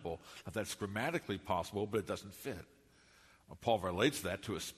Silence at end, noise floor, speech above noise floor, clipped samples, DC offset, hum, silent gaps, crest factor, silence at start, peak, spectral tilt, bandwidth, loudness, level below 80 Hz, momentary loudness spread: 0 s; -65 dBFS; 27 dB; under 0.1%; under 0.1%; none; none; 22 dB; 0 s; -18 dBFS; -4.5 dB/octave; 13.5 kHz; -38 LUFS; -64 dBFS; 12 LU